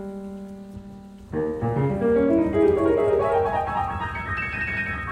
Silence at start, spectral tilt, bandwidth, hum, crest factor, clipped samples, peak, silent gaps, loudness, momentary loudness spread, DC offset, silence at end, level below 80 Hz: 0 s; -8.5 dB/octave; 10 kHz; none; 16 dB; under 0.1%; -8 dBFS; none; -23 LUFS; 19 LU; under 0.1%; 0 s; -42 dBFS